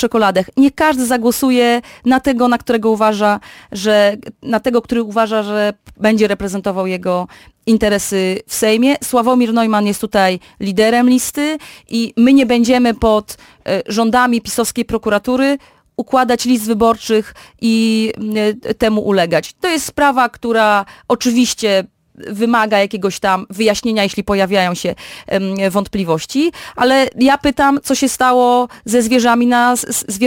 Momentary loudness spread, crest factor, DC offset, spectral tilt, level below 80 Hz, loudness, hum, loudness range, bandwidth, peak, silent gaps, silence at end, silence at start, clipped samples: 8 LU; 12 dB; under 0.1%; -4 dB/octave; -44 dBFS; -14 LUFS; none; 3 LU; 17 kHz; -2 dBFS; none; 0 s; 0 s; under 0.1%